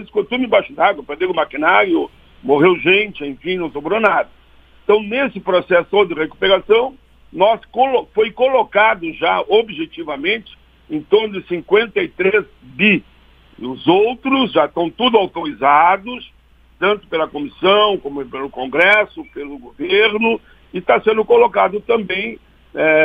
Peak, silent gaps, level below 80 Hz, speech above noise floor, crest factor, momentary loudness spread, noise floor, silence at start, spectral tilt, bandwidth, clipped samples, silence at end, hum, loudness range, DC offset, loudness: 0 dBFS; none; -50 dBFS; 31 dB; 16 dB; 14 LU; -47 dBFS; 0 s; -7 dB/octave; 5 kHz; under 0.1%; 0 s; none; 2 LU; under 0.1%; -16 LUFS